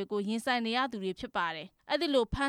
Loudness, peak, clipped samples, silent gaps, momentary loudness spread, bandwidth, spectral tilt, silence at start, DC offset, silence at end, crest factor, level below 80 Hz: -32 LUFS; -16 dBFS; under 0.1%; none; 7 LU; 15 kHz; -4.5 dB/octave; 0 s; under 0.1%; 0 s; 16 dB; -52 dBFS